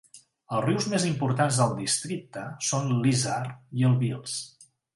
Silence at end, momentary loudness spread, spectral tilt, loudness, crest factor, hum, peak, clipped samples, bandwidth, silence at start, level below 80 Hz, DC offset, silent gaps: 0.3 s; 11 LU; -5 dB/octave; -27 LUFS; 18 dB; none; -8 dBFS; under 0.1%; 11.5 kHz; 0.15 s; -64 dBFS; under 0.1%; none